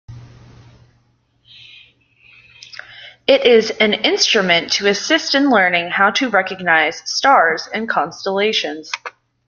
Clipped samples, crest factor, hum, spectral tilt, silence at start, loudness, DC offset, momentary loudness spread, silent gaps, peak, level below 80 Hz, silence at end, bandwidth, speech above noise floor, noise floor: under 0.1%; 18 dB; none; -2.5 dB/octave; 0.1 s; -15 LUFS; under 0.1%; 15 LU; none; 0 dBFS; -60 dBFS; 0.4 s; 7.4 kHz; 44 dB; -59 dBFS